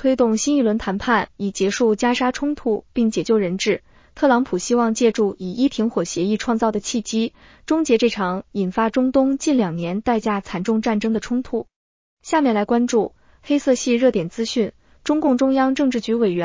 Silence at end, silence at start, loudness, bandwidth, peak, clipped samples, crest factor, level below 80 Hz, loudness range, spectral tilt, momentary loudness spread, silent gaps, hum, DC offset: 0 s; 0 s; -20 LUFS; 7.6 kHz; -4 dBFS; under 0.1%; 16 dB; -50 dBFS; 2 LU; -5 dB/octave; 6 LU; 11.76-12.17 s; none; under 0.1%